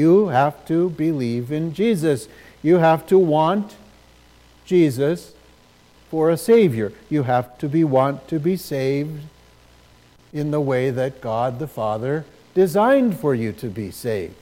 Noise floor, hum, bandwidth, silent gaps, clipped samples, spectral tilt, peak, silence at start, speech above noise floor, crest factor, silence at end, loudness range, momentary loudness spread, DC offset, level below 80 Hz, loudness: -52 dBFS; none; 16.5 kHz; none; under 0.1%; -7.5 dB/octave; -4 dBFS; 0 s; 33 dB; 16 dB; 0.05 s; 5 LU; 12 LU; under 0.1%; -56 dBFS; -20 LUFS